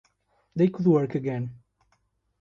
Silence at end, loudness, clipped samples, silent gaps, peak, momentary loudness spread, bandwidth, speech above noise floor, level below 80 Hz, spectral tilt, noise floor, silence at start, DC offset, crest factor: 0.85 s; -25 LUFS; under 0.1%; none; -10 dBFS; 15 LU; 7 kHz; 47 dB; -64 dBFS; -10 dB/octave; -71 dBFS; 0.55 s; under 0.1%; 18 dB